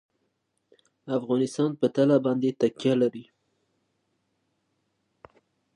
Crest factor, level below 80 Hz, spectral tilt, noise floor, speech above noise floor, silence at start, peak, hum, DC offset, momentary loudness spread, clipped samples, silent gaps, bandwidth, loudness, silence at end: 18 dB; -76 dBFS; -7 dB/octave; -76 dBFS; 52 dB; 1.05 s; -10 dBFS; none; under 0.1%; 8 LU; under 0.1%; none; 10.5 kHz; -25 LUFS; 2.55 s